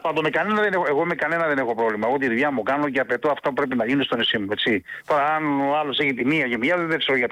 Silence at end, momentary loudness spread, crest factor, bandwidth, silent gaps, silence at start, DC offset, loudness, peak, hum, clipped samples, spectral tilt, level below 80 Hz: 0 s; 3 LU; 10 dB; 14.5 kHz; none; 0.05 s; under 0.1%; -22 LUFS; -12 dBFS; none; under 0.1%; -6 dB/octave; -62 dBFS